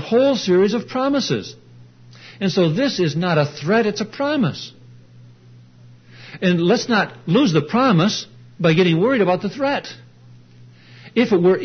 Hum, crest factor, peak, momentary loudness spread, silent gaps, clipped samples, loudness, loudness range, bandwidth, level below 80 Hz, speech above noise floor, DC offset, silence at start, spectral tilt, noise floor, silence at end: none; 16 dB; -4 dBFS; 9 LU; none; under 0.1%; -18 LUFS; 5 LU; 6.6 kHz; -62 dBFS; 28 dB; under 0.1%; 0 s; -6 dB/octave; -46 dBFS; 0 s